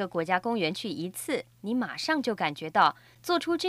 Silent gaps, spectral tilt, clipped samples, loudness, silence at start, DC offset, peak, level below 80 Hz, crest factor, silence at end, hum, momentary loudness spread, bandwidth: none; -4 dB/octave; under 0.1%; -29 LUFS; 0 s; under 0.1%; -10 dBFS; -70 dBFS; 20 dB; 0 s; none; 9 LU; 15.5 kHz